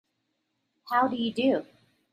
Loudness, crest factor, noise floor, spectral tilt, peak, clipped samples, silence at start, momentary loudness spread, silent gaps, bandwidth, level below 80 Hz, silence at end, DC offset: -27 LUFS; 18 dB; -78 dBFS; -6 dB/octave; -12 dBFS; under 0.1%; 0.85 s; 4 LU; none; 15 kHz; -74 dBFS; 0.5 s; under 0.1%